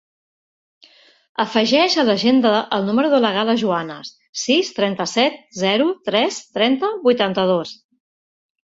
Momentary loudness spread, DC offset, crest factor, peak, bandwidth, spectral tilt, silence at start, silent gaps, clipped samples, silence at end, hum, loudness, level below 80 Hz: 9 LU; under 0.1%; 16 dB; -2 dBFS; 8 kHz; -4 dB/octave; 1.4 s; 4.29-4.33 s; under 0.1%; 1 s; none; -18 LUFS; -64 dBFS